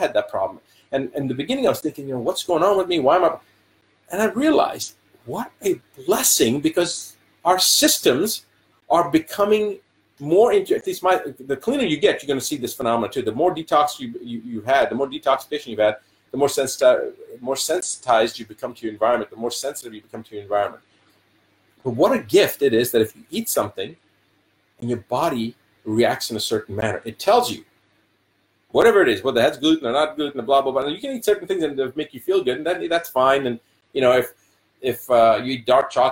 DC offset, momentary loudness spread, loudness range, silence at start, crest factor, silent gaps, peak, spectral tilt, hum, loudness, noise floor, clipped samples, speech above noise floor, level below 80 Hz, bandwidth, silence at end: under 0.1%; 14 LU; 5 LU; 0 s; 18 dB; none; -2 dBFS; -3.5 dB/octave; none; -20 LUFS; -65 dBFS; under 0.1%; 45 dB; -60 dBFS; 17 kHz; 0 s